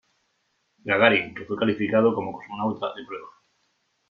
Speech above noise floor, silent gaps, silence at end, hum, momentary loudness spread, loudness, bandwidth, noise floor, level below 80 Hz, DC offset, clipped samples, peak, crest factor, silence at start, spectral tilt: 48 dB; none; 0.8 s; none; 19 LU; -23 LUFS; 6.4 kHz; -72 dBFS; -66 dBFS; under 0.1%; under 0.1%; -2 dBFS; 24 dB; 0.85 s; -7.5 dB/octave